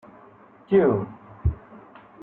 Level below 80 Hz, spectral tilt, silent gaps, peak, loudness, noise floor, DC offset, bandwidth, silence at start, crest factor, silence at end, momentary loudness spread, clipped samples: -40 dBFS; -12 dB/octave; none; -6 dBFS; -23 LUFS; -51 dBFS; under 0.1%; 3.8 kHz; 0.7 s; 20 dB; 0.45 s; 17 LU; under 0.1%